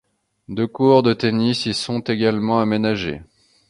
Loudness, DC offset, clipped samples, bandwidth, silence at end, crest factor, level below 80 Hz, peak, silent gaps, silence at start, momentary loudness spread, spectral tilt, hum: -19 LUFS; under 0.1%; under 0.1%; 11.5 kHz; 0.45 s; 18 dB; -52 dBFS; -2 dBFS; none; 0.5 s; 11 LU; -6 dB/octave; none